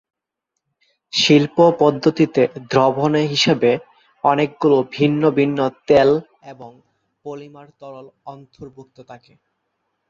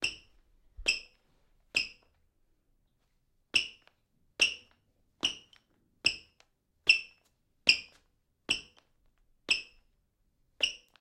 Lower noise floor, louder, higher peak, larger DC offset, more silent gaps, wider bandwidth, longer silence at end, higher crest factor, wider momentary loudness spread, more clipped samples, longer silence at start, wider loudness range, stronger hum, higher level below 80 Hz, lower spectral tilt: first, -80 dBFS vs -74 dBFS; first, -16 LUFS vs -30 LUFS; first, -2 dBFS vs -6 dBFS; neither; neither; second, 7.6 kHz vs 14.5 kHz; first, 0.95 s vs 0.25 s; second, 18 dB vs 30 dB; first, 24 LU vs 20 LU; neither; first, 1.15 s vs 0 s; about the same, 7 LU vs 6 LU; neither; about the same, -58 dBFS vs -62 dBFS; first, -5.5 dB/octave vs 0.5 dB/octave